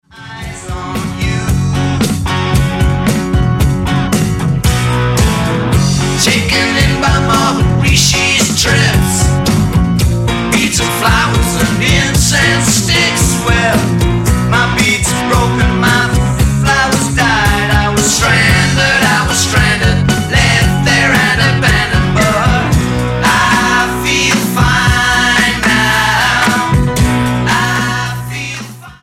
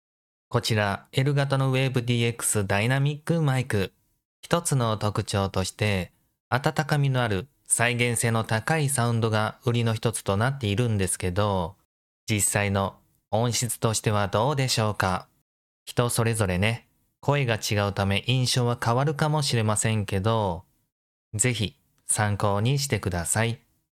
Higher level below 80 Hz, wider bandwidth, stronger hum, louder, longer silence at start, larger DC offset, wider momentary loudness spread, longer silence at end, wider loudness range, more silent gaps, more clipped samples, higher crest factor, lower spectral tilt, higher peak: first, -22 dBFS vs -56 dBFS; about the same, 16.5 kHz vs 16 kHz; neither; first, -11 LUFS vs -25 LUFS; second, 0.15 s vs 0.5 s; neither; about the same, 5 LU vs 6 LU; second, 0.1 s vs 0.45 s; about the same, 3 LU vs 2 LU; second, none vs 4.25-4.43 s, 6.40-6.51 s, 11.85-12.27 s, 15.42-15.86 s, 20.92-21.31 s; neither; second, 12 dB vs 20 dB; about the same, -4 dB/octave vs -4.5 dB/octave; first, 0 dBFS vs -6 dBFS